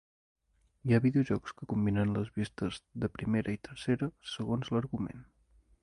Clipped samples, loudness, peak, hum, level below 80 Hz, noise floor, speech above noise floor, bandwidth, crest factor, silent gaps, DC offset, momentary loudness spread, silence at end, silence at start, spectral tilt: under 0.1%; -33 LUFS; -14 dBFS; none; -56 dBFS; -66 dBFS; 34 dB; 11 kHz; 20 dB; none; under 0.1%; 10 LU; 0.6 s; 0.85 s; -7.5 dB/octave